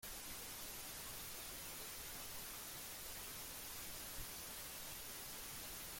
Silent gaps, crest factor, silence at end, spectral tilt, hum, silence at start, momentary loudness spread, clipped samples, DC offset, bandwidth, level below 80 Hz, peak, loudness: none; 14 dB; 0 s; -1 dB/octave; none; 0 s; 0 LU; under 0.1%; under 0.1%; 17 kHz; -64 dBFS; -36 dBFS; -48 LUFS